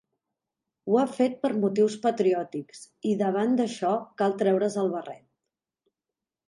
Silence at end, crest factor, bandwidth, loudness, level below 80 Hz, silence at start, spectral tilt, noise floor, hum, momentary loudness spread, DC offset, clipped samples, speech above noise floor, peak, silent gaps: 1.3 s; 16 dB; 11.5 kHz; -26 LUFS; -78 dBFS; 0.85 s; -6.5 dB/octave; -89 dBFS; none; 12 LU; under 0.1%; under 0.1%; 63 dB; -10 dBFS; none